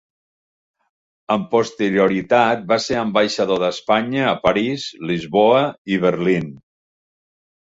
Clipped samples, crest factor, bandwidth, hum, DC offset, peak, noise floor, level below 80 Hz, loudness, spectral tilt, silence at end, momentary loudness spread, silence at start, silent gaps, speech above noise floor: under 0.1%; 18 dB; 8 kHz; none; under 0.1%; -2 dBFS; under -90 dBFS; -56 dBFS; -18 LUFS; -5.5 dB/octave; 1.15 s; 7 LU; 1.3 s; 5.78-5.85 s; over 72 dB